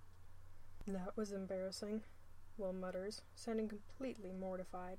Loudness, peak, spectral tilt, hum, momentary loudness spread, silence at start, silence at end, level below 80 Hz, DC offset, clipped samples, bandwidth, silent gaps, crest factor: -46 LUFS; -32 dBFS; -5.5 dB/octave; none; 21 LU; 0 s; 0 s; -60 dBFS; under 0.1%; under 0.1%; 15.5 kHz; none; 14 dB